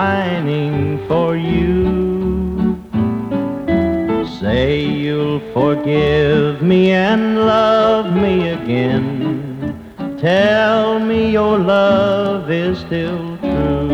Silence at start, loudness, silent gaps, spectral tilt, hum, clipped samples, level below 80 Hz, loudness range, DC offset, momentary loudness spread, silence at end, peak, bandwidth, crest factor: 0 s; -16 LUFS; none; -8 dB/octave; none; under 0.1%; -34 dBFS; 4 LU; under 0.1%; 8 LU; 0 s; -2 dBFS; 8.2 kHz; 14 dB